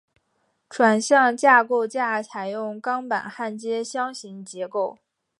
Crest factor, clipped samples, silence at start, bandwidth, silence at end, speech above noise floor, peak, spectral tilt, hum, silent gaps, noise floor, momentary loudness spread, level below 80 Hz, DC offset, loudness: 20 dB; under 0.1%; 0.7 s; 11.5 kHz; 0.5 s; 49 dB; -2 dBFS; -3.5 dB/octave; none; none; -71 dBFS; 14 LU; -80 dBFS; under 0.1%; -22 LUFS